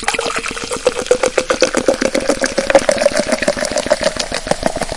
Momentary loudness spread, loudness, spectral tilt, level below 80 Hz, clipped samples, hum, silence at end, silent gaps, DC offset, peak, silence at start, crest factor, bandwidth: 6 LU; -16 LUFS; -2.5 dB/octave; -36 dBFS; under 0.1%; none; 0 s; none; under 0.1%; 0 dBFS; 0 s; 16 dB; 11.5 kHz